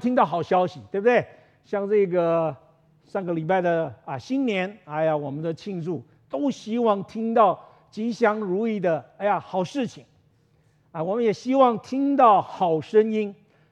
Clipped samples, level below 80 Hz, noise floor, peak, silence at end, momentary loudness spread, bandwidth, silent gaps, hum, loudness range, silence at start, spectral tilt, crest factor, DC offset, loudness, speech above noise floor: under 0.1%; -72 dBFS; -62 dBFS; -4 dBFS; 0.4 s; 12 LU; 9 kHz; none; none; 5 LU; 0 s; -7 dB/octave; 20 dB; under 0.1%; -24 LUFS; 39 dB